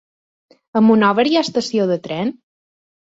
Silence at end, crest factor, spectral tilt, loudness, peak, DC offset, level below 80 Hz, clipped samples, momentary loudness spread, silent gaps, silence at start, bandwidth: 0.8 s; 16 dB; -5.5 dB/octave; -17 LUFS; -2 dBFS; under 0.1%; -62 dBFS; under 0.1%; 11 LU; none; 0.75 s; 7.8 kHz